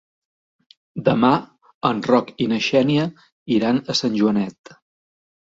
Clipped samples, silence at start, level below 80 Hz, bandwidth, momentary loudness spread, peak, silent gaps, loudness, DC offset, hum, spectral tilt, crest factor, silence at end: under 0.1%; 0.95 s; -60 dBFS; 7.8 kHz; 7 LU; -2 dBFS; 1.74-1.81 s, 3.32-3.46 s; -20 LUFS; under 0.1%; none; -6 dB/octave; 20 dB; 0.95 s